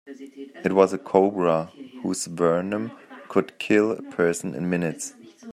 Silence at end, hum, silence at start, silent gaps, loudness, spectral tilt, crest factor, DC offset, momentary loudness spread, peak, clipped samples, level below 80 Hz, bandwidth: 0 s; none; 0.05 s; none; -24 LUFS; -5.5 dB/octave; 22 dB; under 0.1%; 16 LU; -2 dBFS; under 0.1%; -68 dBFS; 14.5 kHz